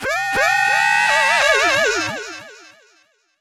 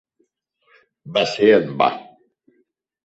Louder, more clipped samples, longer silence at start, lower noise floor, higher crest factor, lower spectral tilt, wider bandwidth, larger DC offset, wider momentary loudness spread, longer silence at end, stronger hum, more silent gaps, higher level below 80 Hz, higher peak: first, -15 LUFS vs -18 LUFS; neither; second, 0 s vs 1.05 s; second, -59 dBFS vs -68 dBFS; about the same, 18 dB vs 20 dB; second, -1 dB/octave vs -5 dB/octave; first, 17.5 kHz vs 8 kHz; neither; first, 14 LU vs 9 LU; second, 0.85 s vs 1.05 s; neither; neither; first, -52 dBFS vs -64 dBFS; about the same, 0 dBFS vs -2 dBFS